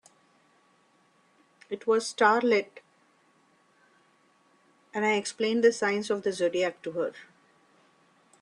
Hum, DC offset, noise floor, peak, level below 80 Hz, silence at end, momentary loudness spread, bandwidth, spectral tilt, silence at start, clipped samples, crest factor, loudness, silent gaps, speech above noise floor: none; under 0.1%; -65 dBFS; -8 dBFS; -80 dBFS; 1.2 s; 11 LU; 11 kHz; -3.5 dB/octave; 1.7 s; under 0.1%; 22 dB; -27 LUFS; none; 39 dB